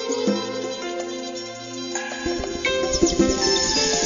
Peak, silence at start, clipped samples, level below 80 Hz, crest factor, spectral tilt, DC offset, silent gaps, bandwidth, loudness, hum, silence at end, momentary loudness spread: -4 dBFS; 0 s; under 0.1%; -40 dBFS; 18 dB; -2.5 dB/octave; under 0.1%; none; 7.4 kHz; -23 LUFS; none; 0 s; 12 LU